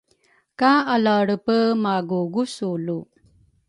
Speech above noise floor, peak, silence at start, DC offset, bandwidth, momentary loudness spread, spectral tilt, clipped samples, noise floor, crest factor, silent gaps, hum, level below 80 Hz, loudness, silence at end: 42 dB; -4 dBFS; 0.6 s; under 0.1%; 11.5 kHz; 9 LU; -6 dB/octave; under 0.1%; -62 dBFS; 18 dB; none; none; -66 dBFS; -21 LUFS; 0.65 s